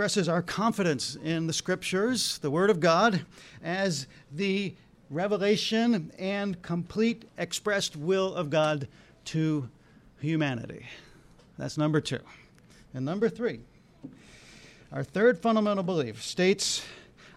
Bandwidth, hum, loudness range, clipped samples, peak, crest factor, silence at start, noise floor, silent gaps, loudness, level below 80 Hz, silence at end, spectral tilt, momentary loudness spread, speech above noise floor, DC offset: 16 kHz; none; 6 LU; under 0.1%; -10 dBFS; 18 dB; 0 s; -56 dBFS; none; -28 LUFS; -64 dBFS; 0.05 s; -4.5 dB/octave; 16 LU; 28 dB; under 0.1%